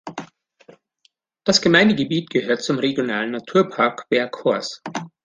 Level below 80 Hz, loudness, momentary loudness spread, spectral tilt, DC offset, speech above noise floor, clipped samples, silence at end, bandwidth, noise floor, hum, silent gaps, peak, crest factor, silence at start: -62 dBFS; -20 LUFS; 14 LU; -4.5 dB/octave; under 0.1%; 44 dB; under 0.1%; 0.15 s; 9.8 kHz; -63 dBFS; none; none; -2 dBFS; 20 dB; 0.05 s